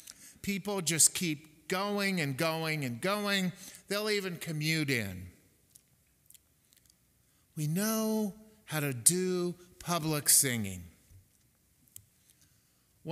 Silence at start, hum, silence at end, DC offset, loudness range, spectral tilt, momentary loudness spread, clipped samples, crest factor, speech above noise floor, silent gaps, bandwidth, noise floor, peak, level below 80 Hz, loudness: 0.1 s; none; 0 s; under 0.1%; 8 LU; -3 dB/octave; 17 LU; under 0.1%; 26 dB; 38 dB; none; 16 kHz; -69 dBFS; -8 dBFS; -68 dBFS; -30 LUFS